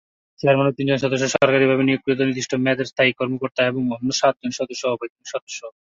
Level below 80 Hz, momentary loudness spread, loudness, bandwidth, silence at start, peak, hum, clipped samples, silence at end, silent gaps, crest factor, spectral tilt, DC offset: -62 dBFS; 11 LU; -20 LUFS; 7.8 kHz; 0.45 s; -2 dBFS; none; under 0.1%; 0.15 s; 5.10-5.16 s, 5.42-5.47 s; 18 dB; -5 dB/octave; under 0.1%